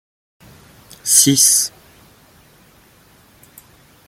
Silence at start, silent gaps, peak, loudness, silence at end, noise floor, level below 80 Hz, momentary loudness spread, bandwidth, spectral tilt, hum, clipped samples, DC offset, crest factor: 1.05 s; none; 0 dBFS; -12 LUFS; 2.4 s; -50 dBFS; -58 dBFS; 15 LU; 17 kHz; -1.5 dB/octave; none; under 0.1%; under 0.1%; 20 dB